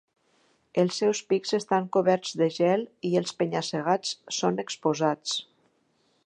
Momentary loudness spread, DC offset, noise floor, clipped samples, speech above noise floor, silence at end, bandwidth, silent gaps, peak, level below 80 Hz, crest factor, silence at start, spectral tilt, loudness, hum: 5 LU; under 0.1%; -69 dBFS; under 0.1%; 43 dB; 0.8 s; 10.5 kHz; none; -8 dBFS; -76 dBFS; 18 dB; 0.75 s; -4.5 dB/octave; -27 LUFS; none